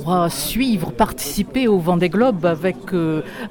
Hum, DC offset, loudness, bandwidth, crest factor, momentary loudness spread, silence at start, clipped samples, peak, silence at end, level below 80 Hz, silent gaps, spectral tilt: none; under 0.1%; -19 LUFS; 17.5 kHz; 14 dB; 6 LU; 0 s; under 0.1%; -4 dBFS; 0 s; -40 dBFS; none; -5.5 dB/octave